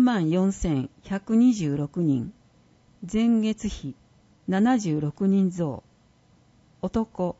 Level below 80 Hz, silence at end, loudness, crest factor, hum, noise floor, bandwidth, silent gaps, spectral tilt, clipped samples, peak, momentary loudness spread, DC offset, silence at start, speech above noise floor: -48 dBFS; 0.05 s; -25 LUFS; 14 dB; none; -59 dBFS; 8 kHz; none; -7 dB/octave; under 0.1%; -10 dBFS; 15 LU; under 0.1%; 0 s; 36 dB